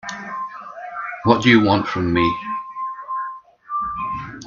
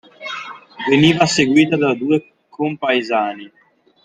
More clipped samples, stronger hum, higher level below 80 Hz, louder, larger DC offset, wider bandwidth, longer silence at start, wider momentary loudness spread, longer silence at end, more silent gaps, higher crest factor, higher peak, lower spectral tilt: neither; neither; first, -50 dBFS vs -56 dBFS; second, -20 LUFS vs -16 LUFS; neither; second, 7.2 kHz vs 9.4 kHz; second, 0.05 s vs 0.2 s; about the same, 18 LU vs 16 LU; second, 0 s vs 0.55 s; neither; about the same, 20 dB vs 18 dB; about the same, 0 dBFS vs 0 dBFS; about the same, -6 dB/octave vs -5 dB/octave